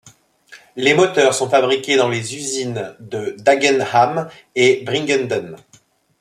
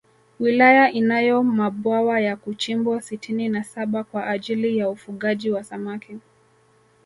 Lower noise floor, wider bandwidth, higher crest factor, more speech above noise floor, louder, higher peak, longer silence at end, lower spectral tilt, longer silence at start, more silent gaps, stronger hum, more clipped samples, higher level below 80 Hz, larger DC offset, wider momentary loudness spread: second, -54 dBFS vs -58 dBFS; first, 13.5 kHz vs 11.5 kHz; about the same, 16 dB vs 20 dB; about the same, 37 dB vs 37 dB; first, -17 LUFS vs -21 LUFS; about the same, -2 dBFS vs -2 dBFS; second, 0.65 s vs 0.85 s; second, -3.5 dB/octave vs -5.5 dB/octave; second, 0.05 s vs 0.4 s; neither; neither; neither; about the same, -64 dBFS vs -68 dBFS; neither; about the same, 12 LU vs 13 LU